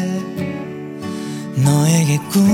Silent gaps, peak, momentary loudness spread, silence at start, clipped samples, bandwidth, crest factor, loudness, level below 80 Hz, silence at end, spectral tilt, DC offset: none; -2 dBFS; 14 LU; 0 s; under 0.1%; 17.5 kHz; 16 dB; -18 LUFS; -56 dBFS; 0 s; -6 dB/octave; under 0.1%